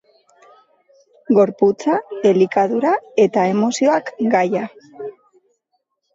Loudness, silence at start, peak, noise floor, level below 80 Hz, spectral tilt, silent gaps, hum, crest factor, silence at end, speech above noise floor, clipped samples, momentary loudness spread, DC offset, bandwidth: -17 LUFS; 1.3 s; -4 dBFS; -71 dBFS; -68 dBFS; -6 dB/octave; none; none; 16 dB; 1.05 s; 55 dB; under 0.1%; 16 LU; under 0.1%; 7.8 kHz